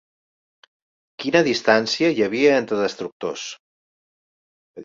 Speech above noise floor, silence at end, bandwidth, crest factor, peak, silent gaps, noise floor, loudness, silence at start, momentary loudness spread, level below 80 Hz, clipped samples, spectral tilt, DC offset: over 70 dB; 0 s; 7.6 kHz; 20 dB; -2 dBFS; 3.12-3.20 s, 3.60-4.74 s; under -90 dBFS; -20 LUFS; 1.2 s; 12 LU; -64 dBFS; under 0.1%; -4 dB/octave; under 0.1%